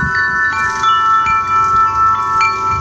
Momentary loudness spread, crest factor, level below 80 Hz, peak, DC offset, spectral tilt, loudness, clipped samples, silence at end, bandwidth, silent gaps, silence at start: 3 LU; 12 dB; -38 dBFS; -2 dBFS; under 0.1%; -3 dB/octave; -12 LUFS; under 0.1%; 0 s; 8.4 kHz; none; 0 s